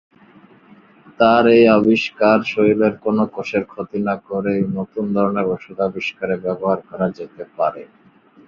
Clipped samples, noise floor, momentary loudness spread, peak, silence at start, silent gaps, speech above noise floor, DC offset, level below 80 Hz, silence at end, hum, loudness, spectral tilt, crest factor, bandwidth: under 0.1%; -50 dBFS; 12 LU; -2 dBFS; 1.2 s; none; 32 dB; under 0.1%; -56 dBFS; 0.65 s; none; -18 LUFS; -7.5 dB/octave; 16 dB; 7 kHz